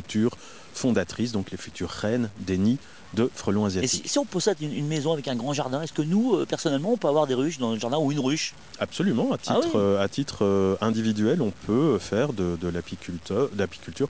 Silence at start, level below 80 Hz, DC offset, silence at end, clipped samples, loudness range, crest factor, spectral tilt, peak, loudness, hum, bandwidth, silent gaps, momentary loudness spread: 0 s; -50 dBFS; 0.4%; 0 s; under 0.1%; 3 LU; 16 dB; -5.5 dB/octave; -10 dBFS; -26 LUFS; none; 8 kHz; none; 8 LU